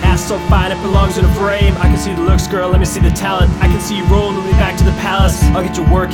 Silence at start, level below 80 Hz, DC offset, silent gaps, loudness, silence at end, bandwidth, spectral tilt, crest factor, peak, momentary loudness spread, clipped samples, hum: 0 s; -16 dBFS; 0.2%; none; -13 LUFS; 0 s; 16.5 kHz; -6 dB/octave; 12 dB; 0 dBFS; 2 LU; under 0.1%; none